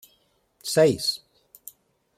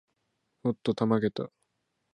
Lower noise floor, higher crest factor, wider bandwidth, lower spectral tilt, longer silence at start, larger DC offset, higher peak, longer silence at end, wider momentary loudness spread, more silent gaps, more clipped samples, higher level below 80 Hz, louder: second, -66 dBFS vs -78 dBFS; about the same, 20 dB vs 20 dB; first, 16 kHz vs 9.6 kHz; second, -4 dB/octave vs -8 dB/octave; about the same, 0.65 s vs 0.65 s; neither; about the same, -8 dBFS vs -10 dBFS; first, 1 s vs 0.65 s; first, 25 LU vs 12 LU; neither; neither; about the same, -64 dBFS vs -68 dBFS; first, -22 LUFS vs -30 LUFS